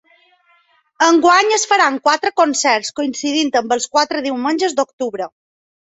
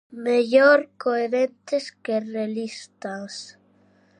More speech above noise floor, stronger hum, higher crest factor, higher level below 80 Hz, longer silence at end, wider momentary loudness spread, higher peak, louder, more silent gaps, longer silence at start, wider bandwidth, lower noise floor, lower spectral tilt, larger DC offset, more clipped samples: first, 41 dB vs 37 dB; neither; about the same, 16 dB vs 20 dB; first, -64 dBFS vs -80 dBFS; about the same, 0.6 s vs 0.7 s; second, 10 LU vs 19 LU; first, 0 dBFS vs -4 dBFS; first, -15 LUFS vs -22 LUFS; first, 4.93-4.98 s vs none; first, 1 s vs 0.1 s; second, 8.4 kHz vs 10 kHz; about the same, -57 dBFS vs -59 dBFS; second, -1 dB/octave vs -4.5 dB/octave; neither; neither